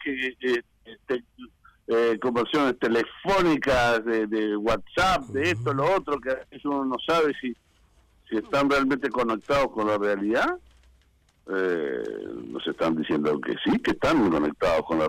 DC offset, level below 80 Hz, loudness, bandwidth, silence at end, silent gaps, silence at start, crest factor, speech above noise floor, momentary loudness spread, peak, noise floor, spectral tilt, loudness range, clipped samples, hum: under 0.1%; -50 dBFS; -25 LUFS; 16 kHz; 0 s; none; 0 s; 10 dB; 38 dB; 10 LU; -16 dBFS; -63 dBFS; -5.5 dB/octave; 4 LU; under 0.1%; none